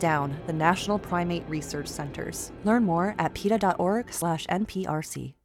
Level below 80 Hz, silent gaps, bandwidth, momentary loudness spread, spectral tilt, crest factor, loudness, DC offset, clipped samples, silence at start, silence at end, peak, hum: -52 dBFS; none; 17 kHz; 10 LU; -5.5 dB/octave; 20 dB; -27 LUFS; under 0.1%; under 0.1%; 0 s; 0.15 s; -6 dBFS; none